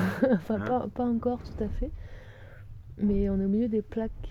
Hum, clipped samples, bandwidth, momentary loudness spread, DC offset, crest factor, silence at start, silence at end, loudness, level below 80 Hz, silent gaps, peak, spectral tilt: none; under 0.1%; 13.5 kHz; 22 LU; under 0.1%; 18 dB; 0 s; 0 s; -29 LUFS; -40 dBFS; none; -10 dBFS; -9 dB/octave